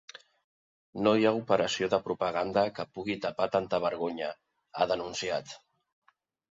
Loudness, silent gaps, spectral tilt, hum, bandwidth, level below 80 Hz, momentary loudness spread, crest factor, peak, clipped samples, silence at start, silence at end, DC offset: -30 LUFS; 0.44-0.93 s; -4.5 dB/octave; none; 7.8 kHz; -66 dBFS; 18 LU; 20 dB; -12 dBFS; under 0.1%; 0.15 s; 0.95 s; under 0.1%